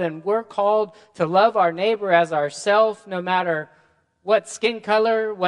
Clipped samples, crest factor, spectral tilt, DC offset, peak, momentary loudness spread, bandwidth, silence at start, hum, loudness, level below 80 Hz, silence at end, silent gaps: under 0.1%; 18 dB; -4.5 dB/octave; under 0.1%; -2 dBFS; 9 LU; 11 kHz; 0 s; none; -21 LUFS; -74 dBFS; 0 s; none